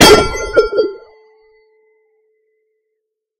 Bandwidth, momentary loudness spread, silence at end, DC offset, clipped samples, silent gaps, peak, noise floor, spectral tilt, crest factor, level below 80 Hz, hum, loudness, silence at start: over 20 kHz; 14 LU; 2.45 s; under 0.1%; 0.7%; none; 0 dBFS; -75 dBFS; -3 dB/octave; 16 dB; -34 dBFS; none; -12 LUFS; 0 s